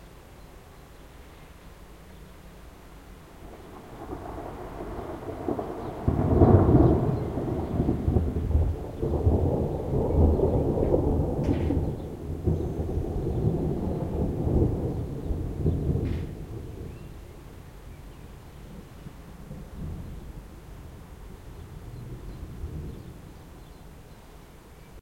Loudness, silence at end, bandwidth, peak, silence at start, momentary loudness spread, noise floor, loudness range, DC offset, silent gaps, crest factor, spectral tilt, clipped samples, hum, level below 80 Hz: -27 LUFS; 0 s; 15.5 kHz; -4 dBFS; 0 s; 24 LU; -48 dBFS; 19 LU; under 0.1%; none; 24 dB; -9.5 dB/octave; under 0.1%; none; -36 dBFS